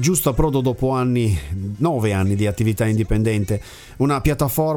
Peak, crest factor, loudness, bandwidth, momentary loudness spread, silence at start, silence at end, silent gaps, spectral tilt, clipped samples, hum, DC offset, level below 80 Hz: -2 dBFS; 16 dB; -20 LUFS; 19.5 kHz; 5 LU; 0 s; 0 s; none; -6 dB/octave; under 0.1%; none; under 0.1%; -32 dBFS